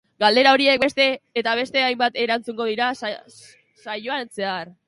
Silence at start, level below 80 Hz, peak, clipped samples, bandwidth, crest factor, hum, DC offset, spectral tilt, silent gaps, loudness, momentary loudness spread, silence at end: 0.2 s; -66 dBFS; 0 dBFS; under 0.1%; 11.5 kHz; 20 dB; none; under 0.1%; -3.5 dB/octave; none; -20 LUFS; 14 LU; 0.15 s